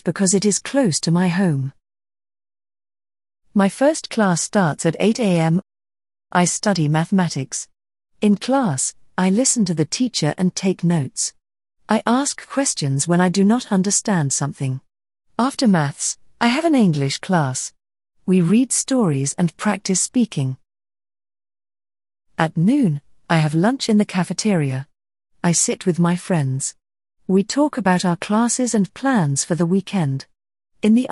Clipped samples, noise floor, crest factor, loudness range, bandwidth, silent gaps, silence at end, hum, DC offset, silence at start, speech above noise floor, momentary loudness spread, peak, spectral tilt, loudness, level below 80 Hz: under 0.1%; under -90 dBFS; 18 dB; 3 LU; 11.5 kHz; none; 0.05 s; none; under 0.1%; 0.05 s; over 72 dB; 8 LU; -2 dBFS; -5 dB/octave; -19 LUFS; -62 dBFS